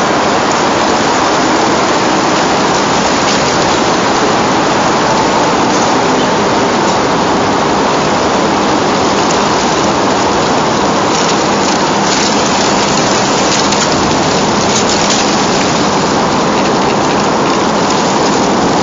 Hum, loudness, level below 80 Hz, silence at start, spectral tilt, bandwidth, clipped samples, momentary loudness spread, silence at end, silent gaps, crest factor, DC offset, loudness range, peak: none; -10 LUFS; -38 dBFS; 0 s; -3.5 dB/octave; 7.8 kHz; under 0.1%; 1 LU; 0 s; none; 10 dB; under 0.1%; 1 LU; 0 dBFS